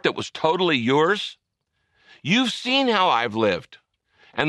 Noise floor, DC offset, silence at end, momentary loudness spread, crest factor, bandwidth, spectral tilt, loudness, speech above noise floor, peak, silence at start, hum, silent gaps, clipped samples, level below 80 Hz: -74 dBFS; under 0.1%; 0 s; 11 LU; 20 dB; 12 kHz; -4.5 dB/octave; -21 LUFS; 53 dB; -4 dBFS; 0.05 s; none; none; under 0.1%; -64 dBFS